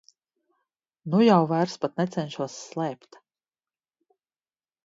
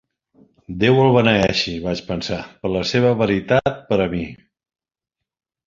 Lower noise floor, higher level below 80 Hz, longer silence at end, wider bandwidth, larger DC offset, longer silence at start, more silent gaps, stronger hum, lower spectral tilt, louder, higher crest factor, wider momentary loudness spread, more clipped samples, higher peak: first, under -90 dBFS vs -84 dBFS; second, -72 dBFS vs -44 dBFS; first, 1.9 s vs 1.3 s; about the same, 7.8 kHz vs 7.6 kHz; neither; first, 1.05 s vs 0.7 s; neither; neither; about the same, -6.5 dB/octave vs -6 dB/octave; second, -25 LUFS vs -18 LUFS; about the same, 22 dB vs 18 dB; about the same, 14 LU vs 12 LU; neither; second, -6 dBFS vs -2 dBFS